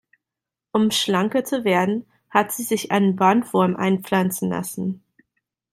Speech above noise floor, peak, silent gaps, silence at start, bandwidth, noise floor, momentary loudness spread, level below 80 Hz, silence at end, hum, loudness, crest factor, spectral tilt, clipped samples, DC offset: 67 dB; -2 dBFS; none; 0.75 s; 16 kHz; -87 dBFS; 9 LU; -64 dBFS; 0.75 s; none; -21 LUFS; 20 dB; -5 dB/octave; under 0.1%; under 0.1%